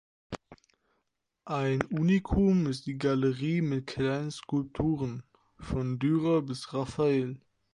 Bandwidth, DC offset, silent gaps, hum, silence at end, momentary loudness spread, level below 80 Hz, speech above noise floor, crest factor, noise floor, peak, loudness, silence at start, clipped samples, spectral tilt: 11 kHz; under 0.1%; none; none; 0.35 s; 16 LU; -48 dBFS; 52 dB; 22 dB; -81 dBFS; -8 dBFS; -30 LUFS; 0.3 s; under 0.1%; -7.5 dB/octave